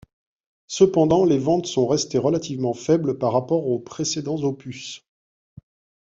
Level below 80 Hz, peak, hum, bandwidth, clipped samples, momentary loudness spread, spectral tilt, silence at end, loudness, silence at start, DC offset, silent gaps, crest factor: -56 dBFS; -4 dBFS; none; 7.8 kHz; under 0.1%; 16 LU; -5.5 dB/octave; 1.1 s; -21 LUFS; 0.7 s; under 0.1%; none; 20 dB